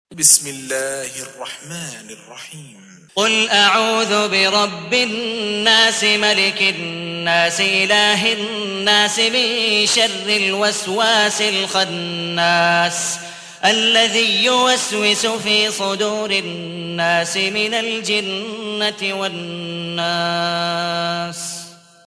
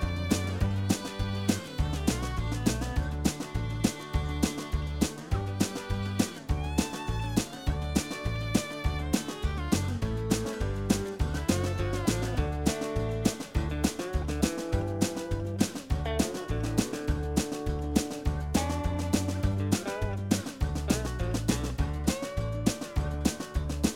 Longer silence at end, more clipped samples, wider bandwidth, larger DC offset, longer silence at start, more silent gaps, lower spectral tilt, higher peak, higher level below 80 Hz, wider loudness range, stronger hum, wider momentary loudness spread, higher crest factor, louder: first, 0.35 s vs 0 s; neither; second, 11 kHz vs 17 kHz; neither; about the same, 0.1 s vs 0 s; neither; second, -1.5 dB/octave vs -5.5 dB/octave; first, 0 dBFS vs -10 dBFS; second, -64 dBFS vs -36 dBFS; first, 6 LU vs 1 LU; neither; first, 14 LU vs 4 LU; about the same, 18 dB vs 20 dB; first, -16 LUFS vs -31 LUFS